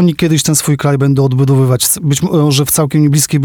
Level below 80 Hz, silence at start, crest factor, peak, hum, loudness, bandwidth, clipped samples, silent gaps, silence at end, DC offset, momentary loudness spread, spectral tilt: -42 dBFS; 0 s; 10 dB; 0 dBFS; none; -11 LUFS; 20 kHz; under 0.1%; none; 0 s; under 0.1%; 2 LU; -5 dB/octave